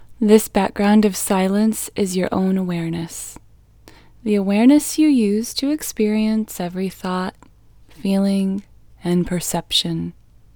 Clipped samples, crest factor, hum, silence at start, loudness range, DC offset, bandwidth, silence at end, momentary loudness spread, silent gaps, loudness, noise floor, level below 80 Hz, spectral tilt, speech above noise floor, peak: under 0.1%; 18 dB; none; 0 s; 4 LU; under 0.1%; over 20 kHz; 0.45 s; 13 LU; none; -19 LUFS; -47 dBFS; -48 dBFS; -5 dB/octave; 29 dB; 0 dBFS